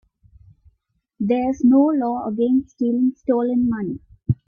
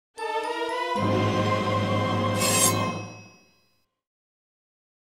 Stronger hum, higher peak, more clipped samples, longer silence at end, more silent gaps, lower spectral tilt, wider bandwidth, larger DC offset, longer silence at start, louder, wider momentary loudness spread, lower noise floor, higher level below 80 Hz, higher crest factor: neither; about the same, -6 dBFS vs -8 dBFS; neither; second, 0.15 s vs 1.9 s; neither; first, -9.5 dB/octave vs -4 dB/octave; second, 6.8 kHz vs 16 kHz; neither; first, 1.2 s vs 0.15 s; first, -20 LUFS vs -24 LUFS; about the same, 11 LU vs 10 LU; about the same, -70 dBFS vs -69 dBFS; first, -50 dBFS vs -58 dBFS; second, 14 dB vs 20 dB